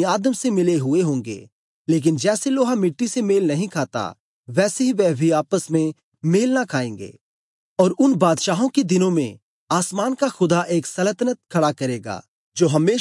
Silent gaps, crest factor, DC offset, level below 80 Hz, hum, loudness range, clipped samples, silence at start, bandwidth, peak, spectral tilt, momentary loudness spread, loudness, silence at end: 1.52-1.85 s, 4.20-4.43 s, 6.03-6.12 s, 7.21-7.76 s, 9.42-9.67 s, 12.28-12.52 s; 16 dB; under 0.1%; -72 dBFS; none; 2 LU; under 0.1%; 0 s; 11.5 kHz; -4 dBFS; -5.5 dB/octave; 11 LU; -20 LUFS; 0 s